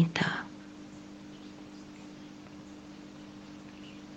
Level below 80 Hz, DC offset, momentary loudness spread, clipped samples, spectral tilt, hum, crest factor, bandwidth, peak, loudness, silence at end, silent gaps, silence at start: -68 dBFS; under 0.1%; 16 LU; under 0.1%; -5.5 dB/octave; 50 Hz at -55 dBFS; 26 dB; 8.4 kHz; -12 dBFS; -41 LUFS; 0 s; none; 0 s